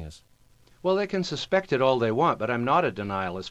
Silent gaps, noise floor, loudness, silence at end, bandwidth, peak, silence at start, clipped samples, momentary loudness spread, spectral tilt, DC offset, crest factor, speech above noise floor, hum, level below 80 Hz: none; -60 dBFS; -25 LUFS; 0 s; 10.5 kHz; -8 dBFS; 0 s; under 0.1%; 7 LU; -6 dB/octave; under 0.1%; 18 dB; 35 dB; none; -56 dBFS